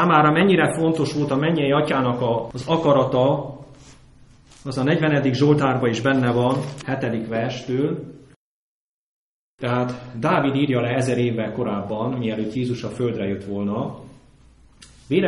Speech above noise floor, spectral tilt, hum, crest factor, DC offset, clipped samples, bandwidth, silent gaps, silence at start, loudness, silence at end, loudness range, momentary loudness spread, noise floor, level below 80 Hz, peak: 31 dB; -7 dB/octave; none; 18 dB; under 0.1%; under 0.1%; 11.5 kHz; 8.36-9.58 s; 0 s; -21 LUFS; 0 s; 6 LU; 9 LU; -51 dBFS; -54 dBFS; -2 dBFS